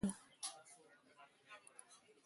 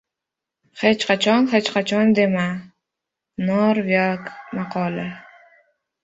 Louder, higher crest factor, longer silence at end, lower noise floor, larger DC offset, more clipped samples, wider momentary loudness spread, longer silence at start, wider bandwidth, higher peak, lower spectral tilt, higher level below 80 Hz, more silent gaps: second, -52 LUFS vs -20 LUFS; about the same, 22 dB vs 20 dB; second, 0.1 s vs 0.85 s; second, -68 dBFS vs -85 dBFS; neither; neither; first, 17 LU vs 14 LU; second, 0 s vs 0.75 s; first, 11.5 kHz vs 8 kHz; second, -28 dBFS vs -2 dBFS; second, -4 dB/octave vs -5.5 dB/octave; second, -74 dBFS vs -62 dBFS; neither